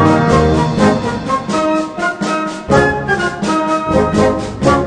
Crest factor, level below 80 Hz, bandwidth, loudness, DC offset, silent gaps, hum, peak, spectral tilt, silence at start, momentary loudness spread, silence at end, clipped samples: 14 dB; -30 dBFS; 10 kHz; -14 LUFS; under 0.1%; none; none; 0 dBFS; -6 dB/octave; 0 s; 6 LU; 0 s; under 0.1%